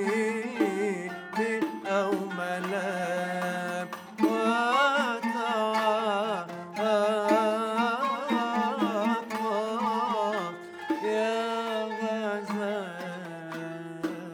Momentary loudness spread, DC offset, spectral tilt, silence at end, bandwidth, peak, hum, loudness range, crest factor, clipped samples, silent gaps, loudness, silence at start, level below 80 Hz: 10 LU; under 0.1%; -5 dB/octave; 0 s; 19.5 kHz; -12 dBFS; none; 4 LU; 16 dB; under 0.1%; none; -29 LUFS; 0 s; -80 dBFS